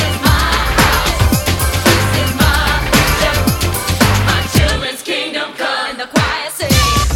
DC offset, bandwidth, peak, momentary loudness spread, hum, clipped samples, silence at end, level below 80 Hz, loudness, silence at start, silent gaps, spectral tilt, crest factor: under 0.1%; over 20 kHz; 0 dBFS; 6 LU; none; under 0.1%; 0 s; -20 dBFS; -13 LUFS; 0 s; none; -4 dB/octave; 14 dB